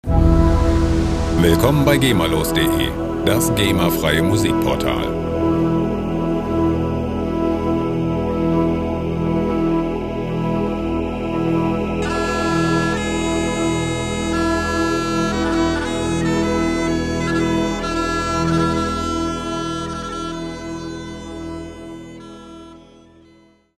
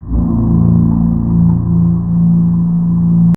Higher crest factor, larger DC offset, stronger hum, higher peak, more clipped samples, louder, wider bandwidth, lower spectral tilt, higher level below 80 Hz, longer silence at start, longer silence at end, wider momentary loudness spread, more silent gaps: first, 18 dB vs 10 dB; second, under 0.1% vs 2%; neither; about the same, 0 dBFS vs 0 dBFS; neither; second, -19 LUFS vs -12 LUFS; first, 15.5 kHz vs 1.4 kHz; second, -5.5 dB/octave vs -13 dB/octave; about the same, -28 dBFS vs -24 dBFS; about the same, 0.05 s vs 0 s; first, 0.95 s vs 0 s; first, 12 LU vs 2 LU; neither